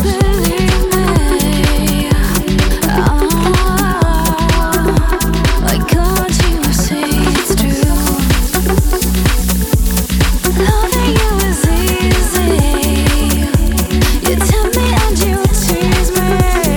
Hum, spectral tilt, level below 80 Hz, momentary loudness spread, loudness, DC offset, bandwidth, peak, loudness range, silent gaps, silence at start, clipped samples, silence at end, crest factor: none; -5 dB/octave; -16 dBFS; 1 LU; -13 LUFS; under 0.1%; 19.5 kHz; 0 dBFS; 1 LU; none; 0 s; under 0.1%; 0 s; 12 dB